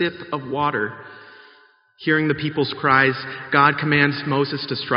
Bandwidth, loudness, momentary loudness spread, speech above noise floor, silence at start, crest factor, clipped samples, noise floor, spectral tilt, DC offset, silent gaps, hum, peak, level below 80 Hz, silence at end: 5.6 kHz; -20 LUFS; 13 LU; 33 dB; 0 s; 20 dB; under 0.1%; -53 dBFS; -3.5 dB/octave; under 0.1%; none; none; 0 dBFS; -60 dBFS; 0 s